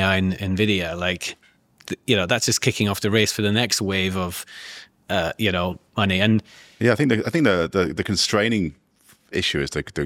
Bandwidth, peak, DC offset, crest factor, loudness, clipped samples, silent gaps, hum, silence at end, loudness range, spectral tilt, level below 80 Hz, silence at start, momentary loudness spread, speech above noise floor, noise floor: 17 kHz; -2 dBFS; under 0.1%; 20 dB; -21 LUFS; under 0.1%; none; none; 0 s; 2 LU; -4 dB/octave; -50 dBFS; 0 s; 11 LU; 35 dB; -57 dBFS